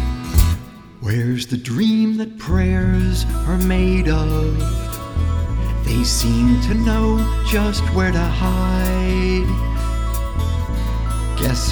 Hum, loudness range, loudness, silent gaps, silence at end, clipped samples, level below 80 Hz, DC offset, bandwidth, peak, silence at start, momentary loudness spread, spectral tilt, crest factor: none; 2 LU; -19 LUFS; none; 0 s; under 0.1%; -20 dBFS; 0.1%; over 20 kHz; -2 dBFS; 0 s; 6 LU; -6 dB/octave; 16 dB